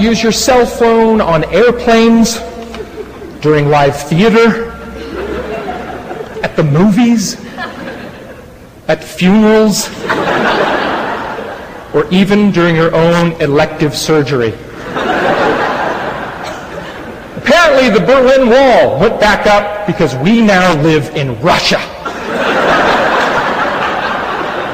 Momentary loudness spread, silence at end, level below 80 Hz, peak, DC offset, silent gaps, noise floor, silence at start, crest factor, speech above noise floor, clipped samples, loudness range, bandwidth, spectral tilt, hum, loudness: 16 LU; 0 s; -36 dBFS; 0 dBFS; under 0.1%; none; -34 dBFS; 0 s; 10 dB; 25 dB; under 0.1%; 6 LU; 15.5 kHz; -5 dB/octave; none; -10 LUFS